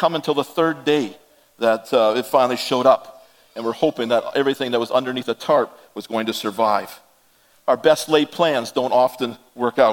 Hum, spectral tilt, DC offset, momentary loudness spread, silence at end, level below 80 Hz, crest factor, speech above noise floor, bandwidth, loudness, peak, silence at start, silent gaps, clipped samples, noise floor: none; -4.5 dB/octave; under 0.1%; 10 LU; 0 s; -70 dBFS; 20 dB; 38 dB; 17.5 kHz; -20 LUFS; 0 dBFS; 0 s; none; under 0.1%; -57 dBFS